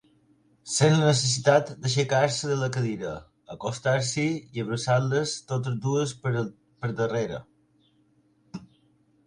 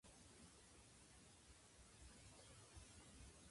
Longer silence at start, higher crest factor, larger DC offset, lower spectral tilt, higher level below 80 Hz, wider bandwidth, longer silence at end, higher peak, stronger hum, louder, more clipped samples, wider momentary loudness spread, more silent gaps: first, 0.65 s vs 0.05 s; first, 22 dB vs 16 dB; neither; first, -5 dB/octave vs -3 dB/octave; first, -62 dBFS vs -72 dBFS; about the same, 11 kHz vs 11.5 kHz; first, 0.6 s vs 0 s; first, -6 dBFS vs -48 dBFS; neither; first, -26 LUFS vs -65 LUFS; neither; first, 17 LU vs 3 LU; neither